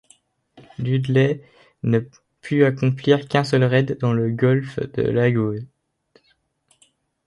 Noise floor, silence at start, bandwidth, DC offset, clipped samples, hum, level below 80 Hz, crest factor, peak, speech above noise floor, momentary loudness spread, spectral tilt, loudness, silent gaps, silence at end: -65 dBFS; 0.8 s; 11 kHz; under 0.1%; under 0.1%; none; -56 dBFS; 18 dB; -2 dBFS; 46 dB; 12 LU; -8 dB/octave; -20 LUFS; none; 1.6 s